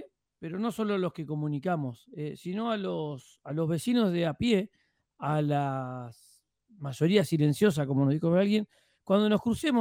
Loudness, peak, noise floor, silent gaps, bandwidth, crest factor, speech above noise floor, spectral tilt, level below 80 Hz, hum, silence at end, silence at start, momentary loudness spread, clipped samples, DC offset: -29 LUFS; -10 dBFS; -62 dBFS; none; 16 kHz; 18 dB; 34 dB; -7 dB/octave; -62 dBFS; none; 0 s; 0 s; 14 LU; under 0.1%; under 0.1%